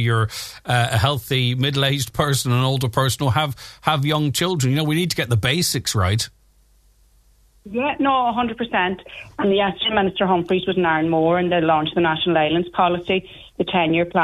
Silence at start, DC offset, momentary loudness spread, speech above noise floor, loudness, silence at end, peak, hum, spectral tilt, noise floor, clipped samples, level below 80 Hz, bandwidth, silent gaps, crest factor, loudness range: 0 s; under 0.1%; 6 LU; 36 dB; -20 LUFS; 0 s; -2 dBFS; none; -5 dB/octave; -56 dBFS; under 0.1%; -48 dBFS; 14 kHz; none; 18 dB; 4 LU